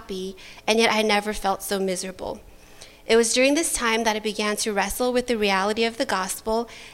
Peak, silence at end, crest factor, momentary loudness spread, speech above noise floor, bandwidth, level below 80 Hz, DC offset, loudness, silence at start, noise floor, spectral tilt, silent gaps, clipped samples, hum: -4 dBFS; 0 s; 18 dB; 14 LU; 23 dB; 16.5 kHz; -48 dBFS; under 0.1%; -23 LUFS; 0 s; -46 dBFS; -2.5 dB/octave; none; under 0.1%; none